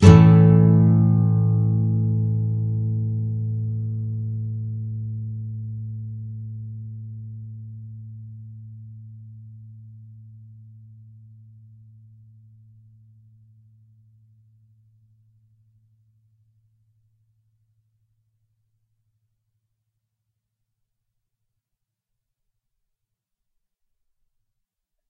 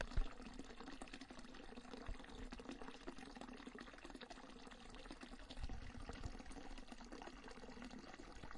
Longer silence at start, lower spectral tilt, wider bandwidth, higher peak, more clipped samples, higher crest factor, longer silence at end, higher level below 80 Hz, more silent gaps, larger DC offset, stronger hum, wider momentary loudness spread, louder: about the same, 0 s vs 0 s; first, -9 dB/octave vs -5 dB/octave; second, 7.6 kHz vs 11 kHz; first, 0 dBFS vs -26 dBFS; neither; about the same, 24 dB vs 26 dB; first, 15.05 s vs 0 s; about the same, -50 dBFS vs -54 dBFS; neither; neither; neither; first, 27 LU vs 4 LU; first, -20 LUFS vs -55 LUFS